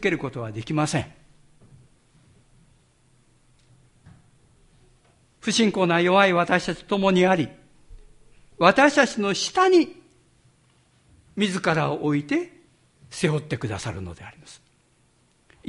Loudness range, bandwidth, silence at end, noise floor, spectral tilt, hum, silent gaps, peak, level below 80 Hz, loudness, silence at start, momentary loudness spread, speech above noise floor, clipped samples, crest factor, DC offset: 11 LU; 11.5 kHz; 1.15 s; -62 dBFS; -5 dB/octave; none; none; -2 dBFS; -54 dBFS; -22 LUFS; 0 s; 15 LU; 41 dB; under 0.1%; 22 dB; under 0.1%